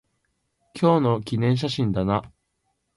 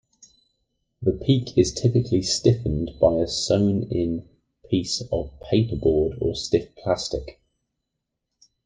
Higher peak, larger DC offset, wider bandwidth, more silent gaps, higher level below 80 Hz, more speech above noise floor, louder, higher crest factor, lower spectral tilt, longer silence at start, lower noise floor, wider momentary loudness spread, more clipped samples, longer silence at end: about the same, -6 dBFS vs -4 dBFS; neither; first, 11.5 kHz vs 9.8 kHz; neither; second, -50 dBFS vs -42 dBFS; second, 52 dB vs 59 dB; about the same, -23 LUFS vs -23 LUFS; about the same, 18 dB vs 18 dB; first, -7.5 dB/octave vs -6 dB/octave; second, 0.75 s vs 1 s; second, -74 dBFS vs -81 dBFS; about the same, 6 LU vs 7 LU; neither; second, 0.7 s vs 1.35 s